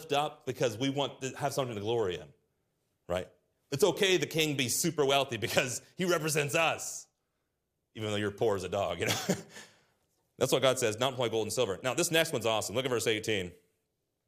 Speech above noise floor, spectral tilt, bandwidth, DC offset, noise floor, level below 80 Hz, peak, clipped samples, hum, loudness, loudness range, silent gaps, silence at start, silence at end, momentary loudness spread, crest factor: 51 dB; -3.5 dB/octave; 15.5 kHz; under 0.1%; -82 dBFS; -70 dBFS; -8 dBFS; under 0.1%; none; -31 LUFS; 6 LU; none; 0 s; 0.75 s; 10 LU; 24 dB